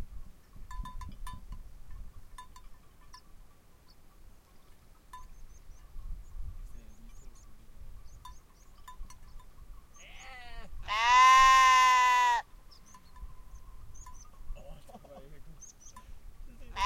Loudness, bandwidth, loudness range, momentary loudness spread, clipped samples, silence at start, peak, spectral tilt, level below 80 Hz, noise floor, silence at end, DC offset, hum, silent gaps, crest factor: -22 LUFS; 15.5 kHz; 26 LU; 31 LU; under 0.1%; 0 s; -12 dBFS; -0.5 dB/octave; -48 dBFS; -56 dBFS; 0 s; under 0.1%; none; none; 20 dB